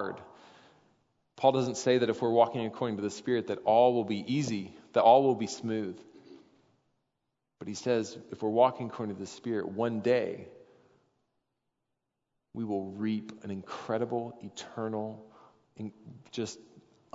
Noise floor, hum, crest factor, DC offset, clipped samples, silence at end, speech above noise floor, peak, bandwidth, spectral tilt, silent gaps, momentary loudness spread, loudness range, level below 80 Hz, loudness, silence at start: -84 dBFS; none; 22 dB; under 0.1%; under 0.1%; 0.55 s; 54 dB; -8 dBFS; 7.8 kHz; -5.5 dB/octave; none; 18 LU; 10 LU; -78 dBFS; -30 LUFS; 0 s